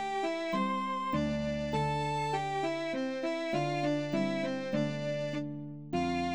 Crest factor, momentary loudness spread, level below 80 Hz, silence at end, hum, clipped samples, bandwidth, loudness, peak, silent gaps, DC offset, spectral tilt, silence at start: 14 dB; 3 LU; -58 dBFS; 0 s; none; under 0.1%; over 20 kHz; -33 LUFS; -18 dBFS; none; 0.2%; -6 dB/octave; 0 s